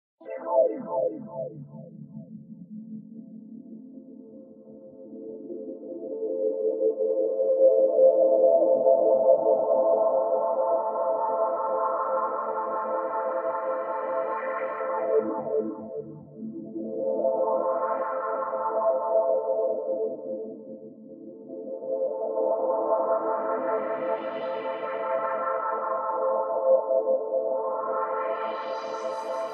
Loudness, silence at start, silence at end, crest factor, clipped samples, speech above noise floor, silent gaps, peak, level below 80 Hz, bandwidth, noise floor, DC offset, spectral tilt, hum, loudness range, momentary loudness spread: -26 LUFS; 0.2 s; 0 s; 18 dB; under 0.1%; 15 dB; none; -8 dBFS; -86 dBFS; 6.4 kHz; -47 dBFS; under 0.1%; -5 dB/octave; none; 15 LU; 22 LU